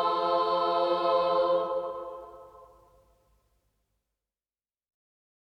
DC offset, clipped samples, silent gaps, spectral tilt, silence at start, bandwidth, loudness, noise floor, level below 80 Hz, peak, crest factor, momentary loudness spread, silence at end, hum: under 0.1%; under 0.1%; none; -6 dB/octave; 0 s; 6 kHz; -27 LUFS; under -90 dBFS; -68 dBFS; -14 dBFS; 16 dB; 16 LU; 2.8 s; none